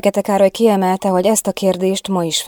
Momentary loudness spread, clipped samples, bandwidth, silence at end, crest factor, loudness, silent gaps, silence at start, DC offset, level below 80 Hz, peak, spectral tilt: 5 LU; under 0.1%; over 20 kHz; 0 s; 14 dB; -15 LUFS; none; 0.05 s; under 0.1%; -56 dBFS; 0 dBFS; -4.5 dB/octave